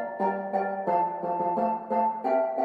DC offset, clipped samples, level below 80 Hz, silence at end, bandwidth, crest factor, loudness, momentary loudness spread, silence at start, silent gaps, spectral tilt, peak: under 0.1%; under 0.1%; -74 dBFS; 0 s; 5.2 kHz; 14 dB; -27 LUFS; 3 LU; 0 s; none; -9 dB/octave; -12 dBFS